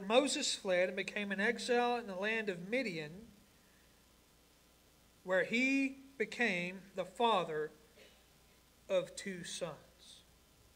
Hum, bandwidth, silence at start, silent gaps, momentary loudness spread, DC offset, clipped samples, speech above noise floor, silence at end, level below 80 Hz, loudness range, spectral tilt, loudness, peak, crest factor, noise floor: none; 16 kHz; 0 s; none; 14 LU; under 0.1%; under 0.1%; 31 dB; 0.55 s; -72 dBFS; 6 LU; -3.5 dB/octave; -36 LUFS; -16 dBFS; 22 dB; -67 dBFS